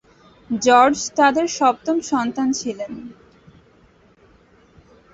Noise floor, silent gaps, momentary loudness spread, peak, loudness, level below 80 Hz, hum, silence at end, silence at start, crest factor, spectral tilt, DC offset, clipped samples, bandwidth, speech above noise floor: -53 dBFS; none; 17 LU; -2 dBFS; -18 LUFS; -58 dBFS; none; 2 s; 0.5 s; 20 dB; -3 dB/octave; under 0.1%; under 0.1%; 8.2 kHz; 35 dB